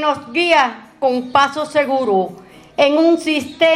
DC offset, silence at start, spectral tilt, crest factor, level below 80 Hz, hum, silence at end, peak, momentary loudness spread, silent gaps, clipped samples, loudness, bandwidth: under 0.1%; 0 s; -4 dB/octave; 16 dB; -60 dBFS; none; 0 s; 0 dBFS; 7 LU; none; under 0.1%; -16 LUFS; 14 kHz